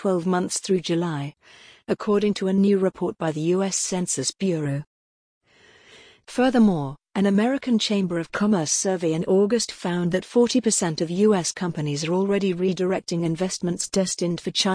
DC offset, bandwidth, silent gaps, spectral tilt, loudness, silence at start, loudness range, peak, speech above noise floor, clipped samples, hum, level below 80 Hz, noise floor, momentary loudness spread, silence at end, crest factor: under 0.1%; 10.5 kHz; 4.87-5.41 s; -4.5 dB/octave; -23 LUFS; 0 s; 3 LU; -8 dBFS; 32 dB; under 0.1%; none; -58 dBFS; -54 dBFS; 7 LU; 0 s; 16 dB